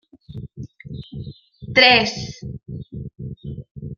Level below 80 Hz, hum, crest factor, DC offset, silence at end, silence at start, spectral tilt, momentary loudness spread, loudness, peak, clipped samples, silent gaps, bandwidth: -48 dBFS; none; 22 dB; under 0.1%; 0.05 s; 0.3 s; -4 dB/octave; 25 LU; -15 LUFS; -2 dBFS; under 0.1%; 3.71-3.75 s; 12 kHz